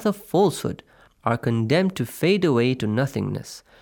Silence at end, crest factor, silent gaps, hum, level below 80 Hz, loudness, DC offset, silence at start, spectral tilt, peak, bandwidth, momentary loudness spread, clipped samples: 0.2 s; 16 dB; none; none; -58 dBFS; -23 LUFS; under 0.1%; 0 s; -6.5 dB/octave; -6 dBFS; over 20 kHz; 11 LU; under 0.1%